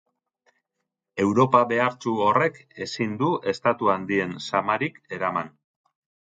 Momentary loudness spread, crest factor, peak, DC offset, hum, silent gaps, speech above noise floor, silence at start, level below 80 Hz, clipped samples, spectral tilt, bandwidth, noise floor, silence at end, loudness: 11 LU; 20 dB; -4 dBFS; under 0.1%; none; none; 58 dB; 1.15 s; -64 dBFS; under 0.1%; -6 dB/octave; 9.2 kHz; -82 dBFS; 0.8 s; -24 LUFS